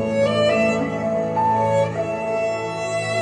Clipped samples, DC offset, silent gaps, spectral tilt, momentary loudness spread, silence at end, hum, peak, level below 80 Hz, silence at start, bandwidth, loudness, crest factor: under 0.1%; under 0.1%; none; -5.5 dB/octave; 6 LU; 0 s; none; -8 dBFS; -52 dBFS; 0 s; 10 kHz; -21 LUFS; 12 dB